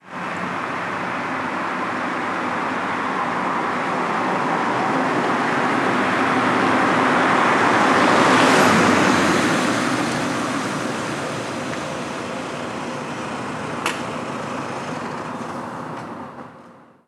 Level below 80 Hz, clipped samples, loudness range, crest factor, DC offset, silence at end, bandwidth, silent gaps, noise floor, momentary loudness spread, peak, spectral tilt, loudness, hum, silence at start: -60 dBFS; under 0.1%; 11 LU; 20 dB; under 0.1%; 0.35 s; 14 kHz; none; -46 dBFS; 13 LU; 0 dBFS; -4.5 dB/octave; -20 LUFS; none; 0.05 s